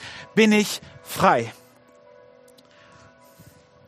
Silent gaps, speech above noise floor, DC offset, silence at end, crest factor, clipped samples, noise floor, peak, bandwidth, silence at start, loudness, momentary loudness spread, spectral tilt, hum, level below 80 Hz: none; 32 dB; under 0.1%; 2.35 s; 22 dB; under 0.1%; -53 dBFS; -2 dBFS; 15 kHz; 0 s; -21 LUFS; 16 LU; -4.5 dB/octave; none; -62 dBFS